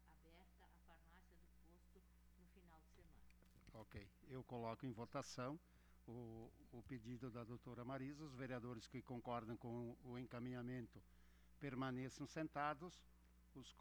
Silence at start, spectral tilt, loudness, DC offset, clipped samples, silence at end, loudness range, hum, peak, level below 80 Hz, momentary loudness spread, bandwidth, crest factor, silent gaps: 0 s; -6 dB/octave; -53 LUFS; under 0.1%; under 0.1%; 0 s; 7 LU; 60 Hz at -70 dBFS; -30 dBFS; -72 dBFS; 14 LU; over 20 kHz; 24 dB; none